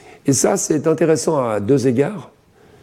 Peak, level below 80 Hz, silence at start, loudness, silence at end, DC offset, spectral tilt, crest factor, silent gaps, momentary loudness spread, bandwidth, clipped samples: -4 dBFS; -58 dBFS; 0.25 s; -17 LUFS; 0.55 s; under 0.1%; -5 dB/octave; 14 dB; none; 4 LU; 16 kHz; under 0.1%